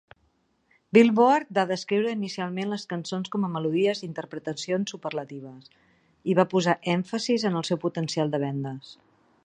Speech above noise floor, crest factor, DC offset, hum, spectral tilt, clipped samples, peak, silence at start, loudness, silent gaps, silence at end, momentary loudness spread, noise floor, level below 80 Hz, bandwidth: 43 dB; 22 dB; under 0.1%; none; -5.5 dB/octave; under 0.1%; -4 dBFS; 0.95 s; -26 LUFS; none; 0.5 s; 14 LU; -69 dBFS; -72 dBFS; 9.8 kHz